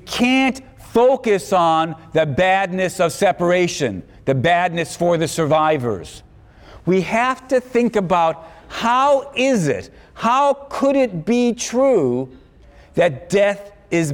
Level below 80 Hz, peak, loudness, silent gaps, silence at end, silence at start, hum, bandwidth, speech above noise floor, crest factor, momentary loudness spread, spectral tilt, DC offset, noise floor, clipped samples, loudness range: -50 dBFS; -6 dBFS; -18 LUFS; none; 0 s; 0.05 s; none; 17 kHz; 28 dB; 12 dB; 9 LU; -5 dB/octave; under 0.1%; -46 dBFS; under 0.1%; 2 LU